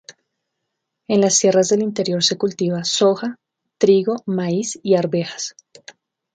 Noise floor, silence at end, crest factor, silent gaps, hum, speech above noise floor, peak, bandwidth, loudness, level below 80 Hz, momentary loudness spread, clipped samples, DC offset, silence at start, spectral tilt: -78 dBFS; 0.85 s; 18 dB; none; none; 60 dB; -2 dBFS; 9.4 kHz; -18 LUFS; -66 dBFS; 10 LU; under 0.1%; under 0.1%; 0.1 s; -4 dB/octave